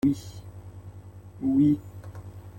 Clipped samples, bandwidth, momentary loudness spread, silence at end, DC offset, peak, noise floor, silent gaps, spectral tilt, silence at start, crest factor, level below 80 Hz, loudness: under 0.1%; 16.5 kHz; 23 LU; 0 s; under 0.1%; -12 dBFS; -45 dBFS; none; -8.5 dB/octave; 0.05 s; 16 dB; -54 dBFS; -25 LUFS